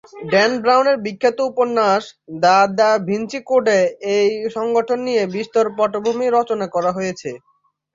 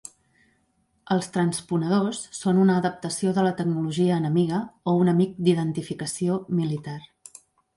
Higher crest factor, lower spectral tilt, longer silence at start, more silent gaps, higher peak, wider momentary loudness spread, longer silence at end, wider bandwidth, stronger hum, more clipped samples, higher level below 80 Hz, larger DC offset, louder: about the same, 16 dB vs 18 dB; second, -4.5 dB/octave vs -6.5 dB/octave; second, 0.15 s vs 1.1 s; neither; first, -2 dBFS vs -8 dBFS; about the same, 8 LU vs 9 LU; second, 0.55 s vs 0.7 s; second, 7.6 kHz vs 11.5 kHz; neither; neither; about the same, -64 dBFS vs -64 dBFS; neither; first, -17 LUFS vs -24 LUFS